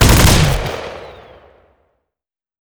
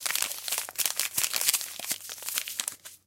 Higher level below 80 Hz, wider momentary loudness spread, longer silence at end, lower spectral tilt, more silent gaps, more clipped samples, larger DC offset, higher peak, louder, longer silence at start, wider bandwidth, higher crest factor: first, -22 dBFS vs -76 dBFS; first, 24 LU vs 8 LU; first, 1.55 s vs 0.1 s; first, -4 dB/octave vs 2.5 dB/octave; neither; neither; neither; about the same, 0 dBFS vs -2 dBFS; first, -13 LUFS vs -28 LUFS; about the same, 0 s vs 0 s; first, over 20 kHz vs 17 kHz; second, 16 dB vs 30 dB